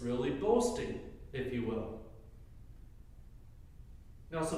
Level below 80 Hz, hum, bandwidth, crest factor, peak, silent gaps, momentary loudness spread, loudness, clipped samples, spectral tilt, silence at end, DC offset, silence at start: -54 dBFS; none; 15 kHz; 20 dB; -16 dBFS; none; 27 LU; -36 LUFS; under 0.1%; -5.5 dB/octave; 0 s; under 0.1%; 0 s